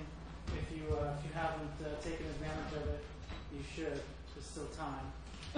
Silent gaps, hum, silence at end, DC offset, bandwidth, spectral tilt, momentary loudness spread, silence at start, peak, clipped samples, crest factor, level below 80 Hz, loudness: none; none; 0 s; under 0.1%; 10.5 kHz; -6 dB/octave; 9 LU; 0 s; -24 dBFS; under 0.1%; 18 dB; -50 dBFS; -43 LUFS